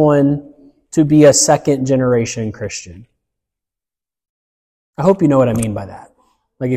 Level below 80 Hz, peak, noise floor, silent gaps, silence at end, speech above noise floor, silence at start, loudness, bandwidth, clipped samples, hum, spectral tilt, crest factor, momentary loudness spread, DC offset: -48 dBFS; 0 dBFS; -89 dBFS; 4.29-4.93 s; 0 s; 76 dB; 0 s; -14 LUFS; 15.5 kHz; under 0.1%; none; -5.5 dB/octave; 16 dB; 17 LU; under 0.1%